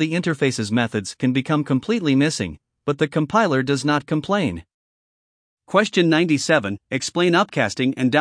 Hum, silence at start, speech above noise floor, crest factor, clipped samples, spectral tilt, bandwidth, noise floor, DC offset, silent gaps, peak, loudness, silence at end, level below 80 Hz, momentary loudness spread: none; 0 s; over 70 dB; 18 dB; under 0.1%; -5 dB/octave; 10.5 kHz; under -90 dBFS; under 0.1%; 4.74-5.57 s; -2 dBFS; -20 LUFS; 0 s; -56 dBFS; 8 LU